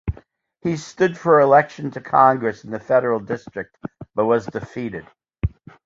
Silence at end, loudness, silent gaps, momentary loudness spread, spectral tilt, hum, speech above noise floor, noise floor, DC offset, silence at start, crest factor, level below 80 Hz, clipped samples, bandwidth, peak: 0.4 s; -20 LUFS; none; 17 LU; -7 dB/octave; none; 31 dB; -50 dBFS; under 0.1%; 0.05 s; 20 dB; -40 dBFS; under 0.1%; 7.8 kHz; -2 dBFS